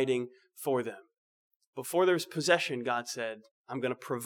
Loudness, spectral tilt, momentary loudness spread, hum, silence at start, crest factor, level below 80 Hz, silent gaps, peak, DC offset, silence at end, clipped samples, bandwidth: -31 LUFS; -4 dB/octave; 16 LU; none; 0 s; 22 dB; under -90 dBFS; 1.18-1.60 s, 1.67-1.73 s, 3.51-3.64 s; -12 dBFS; under 0.1%; 0 s; under 0.1%; 19.5 kHz